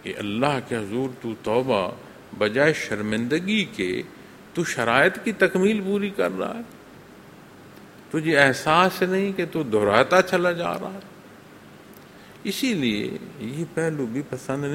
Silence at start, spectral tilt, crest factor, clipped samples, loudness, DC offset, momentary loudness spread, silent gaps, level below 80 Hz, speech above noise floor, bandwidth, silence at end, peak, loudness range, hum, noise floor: 0.05 s; -5 dB/octave; 24 dB; under 0.1%; -23 LUFS; under 0.1%; 13 LU; none; -60 dBFS; 23 dB; 16.5 kHz; 0 s; 0 dBFS; 7 LU; none; -46 dBFS